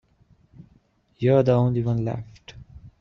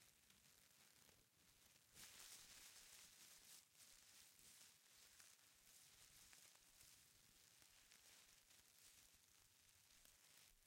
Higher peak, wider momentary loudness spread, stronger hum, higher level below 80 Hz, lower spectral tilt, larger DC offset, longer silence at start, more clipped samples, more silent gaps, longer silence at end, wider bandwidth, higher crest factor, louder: first, -6 dBFS vs -46 dBFS; first, 25 LU vs 8 LU; neither; first, -52 dBFS vs -88 dBFS; first, -9.5 dB/octave vs 0 dB/octave; neither; first, 1.2 s vs 0 s; neither; neither; about the same, 0.1 s vs 0 s; second, 6.4 kHz vs 16.5 kHz; second, 18 dB vs 24 dB; first, -22 LUFS vs -66 LUFS